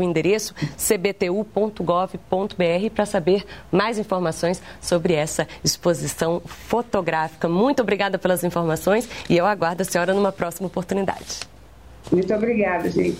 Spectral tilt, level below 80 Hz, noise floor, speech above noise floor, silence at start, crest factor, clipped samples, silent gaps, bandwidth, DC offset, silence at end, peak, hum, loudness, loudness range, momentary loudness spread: -5 dB/octave; -48 dBFS; -45 dBFS; 24 dB; 0 s; 18 dB; under 0.1%; none; 16 kHz; 0.3%; 0 s; -4 dBFS; none; -22 LUFS; 2 LU; 5 LU